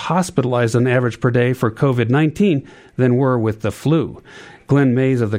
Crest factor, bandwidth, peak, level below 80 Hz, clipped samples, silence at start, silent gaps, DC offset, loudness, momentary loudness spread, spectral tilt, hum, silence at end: 14 dB; 14.5 kHz; -2 dBFS; -52 dBFS; under 0.1%; 0 s; none; under 0.1%; -17 LUFS; 6 LU; -7.5 dB/octave; none; 0 s